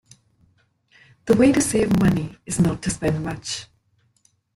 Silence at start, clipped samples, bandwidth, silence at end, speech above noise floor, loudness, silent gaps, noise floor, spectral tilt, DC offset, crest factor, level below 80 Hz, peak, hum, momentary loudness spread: 1.25 s; under 0.1%; 16 kHz; 0.9 s; 45 dB; -21 LUFS; none; -64 dBFS; -5.5 dB/octave; under 0.1%; 18 dB; -44 dBFS; -4 dBFS; none; 13 LU